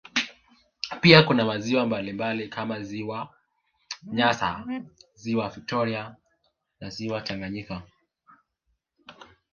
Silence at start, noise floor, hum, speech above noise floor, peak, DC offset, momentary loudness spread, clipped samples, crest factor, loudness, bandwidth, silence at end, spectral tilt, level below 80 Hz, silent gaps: 0.15 s; -76 dBFS; none; 51 dB; 0 dBFS; under 0.1%; 21 LU; under 0.1%; 28 dB; -25 LUFS; 7.2 kHz; 0.3 s; -5.5 dB/octave; -58 dBFS; none